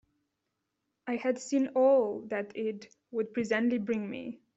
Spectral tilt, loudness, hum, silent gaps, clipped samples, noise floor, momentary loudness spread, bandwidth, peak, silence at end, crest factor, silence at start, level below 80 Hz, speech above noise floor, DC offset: -5.5 dB/octave; -31 LUFS; none; none; under 0.1%; -83 dBFS; 14 LU; 8 kHz; -14 dBFS; 0.2 s; 18 dB; 1.05 s; -76 dBFS; 53 dB; under 0.1%